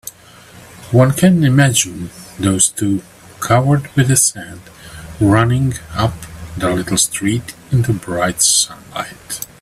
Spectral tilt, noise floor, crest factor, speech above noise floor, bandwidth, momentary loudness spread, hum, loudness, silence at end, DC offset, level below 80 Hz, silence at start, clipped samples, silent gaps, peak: -4.5 dB/octave; -41 dBFS; 16 dB; 26 dB; 15.5 kHz; 19 LU; none; -14 LUFS; 0.15 s; under 0.1%; -42 dBFS; 0.05 s; under 0.1%; none; 0 dBFS